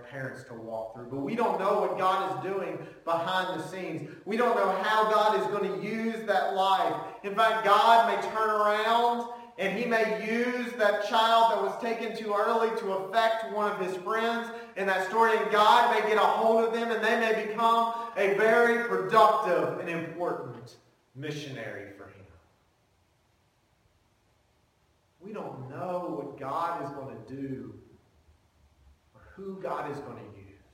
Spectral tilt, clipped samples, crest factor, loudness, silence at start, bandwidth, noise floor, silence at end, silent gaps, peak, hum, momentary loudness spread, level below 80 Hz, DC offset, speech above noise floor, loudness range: -4.5 dB/octave; under 0.1%; 22 dB; -27 LUFS; 0 s; 17 kHz; -69 dBFS; 0.25 s; none; -6 dBFS; none; 17 LU; -72 dBFS; under 0.1%; 41 dB; 16 LU